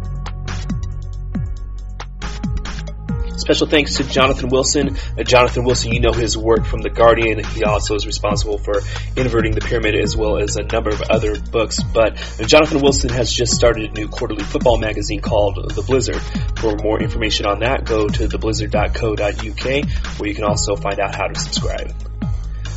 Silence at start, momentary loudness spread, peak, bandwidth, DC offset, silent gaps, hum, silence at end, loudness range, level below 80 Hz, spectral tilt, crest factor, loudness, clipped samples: 0 s; 12 LU; 0 dBFS; 8.2 kHz; under 0.1%; none; none; 0 s; 5 LU; -24 dBFS; -4.5 dB/octave; 18 dB; -18 LUFS; under 0.1%